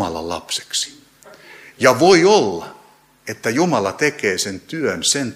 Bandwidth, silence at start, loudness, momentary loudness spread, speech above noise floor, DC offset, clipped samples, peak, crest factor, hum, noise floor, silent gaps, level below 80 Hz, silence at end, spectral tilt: 15.5 kHz; 0 s; -17 LUFS; 16 LU; 33 dB; under 0.1%; under 0.1%; 0 dBFS; 18 dB; none; -50 dBFS; none; -56 dBFS; 0 s; -3.5 dB/octave